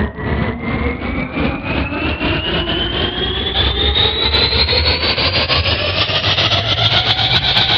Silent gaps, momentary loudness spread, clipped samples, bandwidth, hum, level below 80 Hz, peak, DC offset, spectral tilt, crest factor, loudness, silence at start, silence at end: none; 8 LU; under 0.1%; 7 kHz; none; -26 dBFS; 0 dBFS; under 0.1%; -2 dB/octave; 16 dB; -14 LUFS; 0 s; 0 s